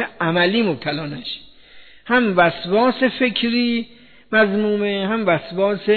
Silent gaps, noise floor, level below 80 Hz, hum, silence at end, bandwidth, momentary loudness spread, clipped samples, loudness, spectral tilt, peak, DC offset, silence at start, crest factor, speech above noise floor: none; -45 dBFS; -56 dBFS; none; 0 s; 4.6 kHz; 10 LU; under 0.1%; -19 LUFS; -8.5 dB/octave; -4 dBFS; 0.3%; 0 s; 16 dB; 26 dB